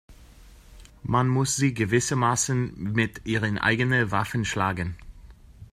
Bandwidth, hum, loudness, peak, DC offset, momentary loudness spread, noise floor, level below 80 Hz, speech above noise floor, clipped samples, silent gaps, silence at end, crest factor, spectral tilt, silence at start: 15.5 kHz; none; -25 LUFS; -8 dBFS; under 0.1%; 5 LU; -49 dBFS; -48 dBFS; 25 dB; under 0.1%; none; 0.05 s; 18 dB; -4.5 dB/octave; 0.1 s